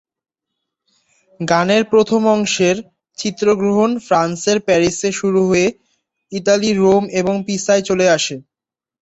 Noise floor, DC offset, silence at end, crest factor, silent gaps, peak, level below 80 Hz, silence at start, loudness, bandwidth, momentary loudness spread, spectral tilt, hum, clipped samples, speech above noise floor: -88 dBFS; under 0.1%; 0.6 s; 14 dB; none; -2 dBFS; -54 dBFS; 1.4 s; -16 LUFS; 8.2 kHz; 9 LU; -4.5 dB/octave; none; under 0.1%; 73 dB